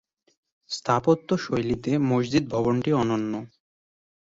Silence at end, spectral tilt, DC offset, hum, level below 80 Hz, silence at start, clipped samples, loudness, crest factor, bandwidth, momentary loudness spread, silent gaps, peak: 0.85 s; -6.5 dB/octave; under 0.1%; none; -54 dBFS; 0.7 s; under 0.1%; -25 LUFS; 18 dB; 8 kHz; 9 LU; none; -8 dBFS